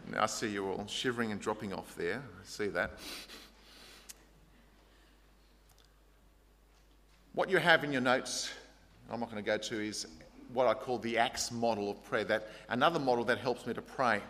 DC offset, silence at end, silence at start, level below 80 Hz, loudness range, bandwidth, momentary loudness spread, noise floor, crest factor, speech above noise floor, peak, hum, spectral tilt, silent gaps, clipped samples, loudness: under 0.1%; 0 s; 0 s; -64 dBFS; 10 LU; 15.5 kHz; 20 LU; -64 dBFS; 26 dB; 30 dB; -10 dBFS; none; -3.5 dB/octave; none; under 0.1%; -34 LUFS